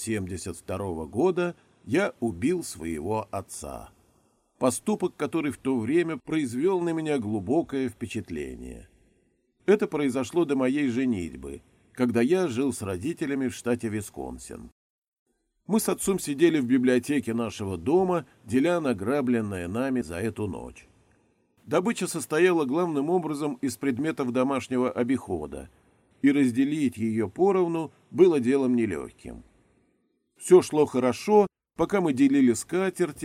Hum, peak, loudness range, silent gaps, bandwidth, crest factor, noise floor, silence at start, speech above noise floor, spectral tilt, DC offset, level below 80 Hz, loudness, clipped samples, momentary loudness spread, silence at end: none; -6 dBFS; 6 LU; 14.72-15.13 s, 15.19-15.26 s; 16 kHz; 20 dB; -71 dBFS; 0 s; 46 dB; -6 dB/octave; under 0.1%; -58 dBFS; -26 LUFS; under 0.1%; 13 LU; 0 s